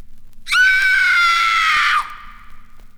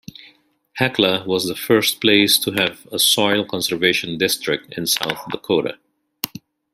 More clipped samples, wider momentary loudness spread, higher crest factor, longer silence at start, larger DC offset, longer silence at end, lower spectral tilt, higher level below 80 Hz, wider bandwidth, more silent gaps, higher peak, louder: neither; second, 7 LU vs 13 LU; second, 12 dB vs 20 dB; second, 0 s vs 0.25 s; neither; second, 0 s vs 0.35 s; second, 2 dB/octave vs -2.5 dB/octave; first, -40 dBFS vs -60 dBFS; first, over 20 kHz vs 16 kHz; neither; second, -4 dBFS vs 0 dBFS; first, -13 LUFS vs -18 LUFS